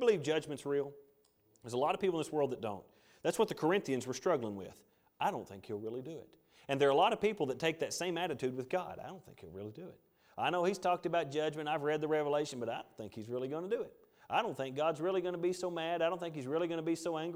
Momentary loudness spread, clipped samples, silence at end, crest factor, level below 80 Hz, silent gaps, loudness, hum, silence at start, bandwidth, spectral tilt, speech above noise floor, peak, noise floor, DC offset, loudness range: 15 LU; under 0.1%; 0 s; 20 dB; -76 dBFS; none; -36 LUFS; none; 0 s; 16.5 kHz; -5 dB/octave; 35 dB; -16 dBFS; -71 dBFS; under 0.1%; 3 LU